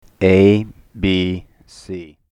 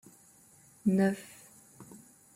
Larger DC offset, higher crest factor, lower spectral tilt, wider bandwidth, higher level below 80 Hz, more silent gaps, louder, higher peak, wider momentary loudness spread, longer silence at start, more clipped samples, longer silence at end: neither; about the same, 16 dB vs 18 dB; about the same, -7.5 dB/octave vs -7 dB/octave; second, 10.5 kHz vs 15.5 kHz; first, -42 dBFS vs -72 dBFS; neither; first, -15 LUFS vs -30 LUFS; first, -2 dBFS vs -16 dBFS; second, 20 LU vs 26 LU; second, 0.2 s vs 0.85 s; neither; second, 0.25 s vs 0.4 s